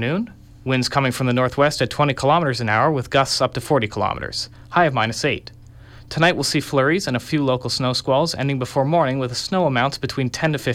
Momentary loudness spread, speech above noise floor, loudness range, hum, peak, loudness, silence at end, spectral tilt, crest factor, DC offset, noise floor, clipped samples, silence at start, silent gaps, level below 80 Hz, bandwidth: 6 LU; 22 dB; 2 LU; none; -4 dBFS; -20 LUFS; 0 s; -5 dB/octave; 16 dB; under 0.1%; -42 dBFS; under 0.1%; 0 s; none; -48 dBFS; 16 kHz